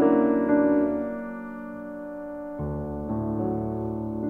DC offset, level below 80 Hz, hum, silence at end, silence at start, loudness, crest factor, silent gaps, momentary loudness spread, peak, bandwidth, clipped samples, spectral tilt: under 0.1%; -46 dBFS; none; 0 s; 0 s; -27 LUFS; 16 dB; none; 15 LU; -10 dBFS; 3 kHz; under 0.1%; -11 dB/octave